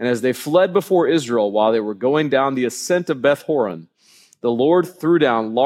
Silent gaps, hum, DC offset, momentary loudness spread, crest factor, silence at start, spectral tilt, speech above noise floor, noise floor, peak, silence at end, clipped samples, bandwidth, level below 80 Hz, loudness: none; none; under 0.1%; 5 LU; 16 dB; 0 s; -5.5 dB/octave; 35 dB; -53 dBFS; -2 dBFS; 0 s; under 0.1%; 16 kHz; -72 dBFS; -18 LUFS